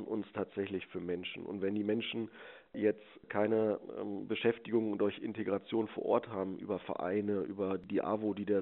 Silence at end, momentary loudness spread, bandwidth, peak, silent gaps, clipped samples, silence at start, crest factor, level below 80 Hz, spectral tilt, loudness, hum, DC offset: 0 s; 8 LU; 4 kHz; -16 dBFS; none; under 0.1%; 0 s; 20 dB; -76 dBFS; -5 dB/octave; -36 LUFS; none; under 0.1%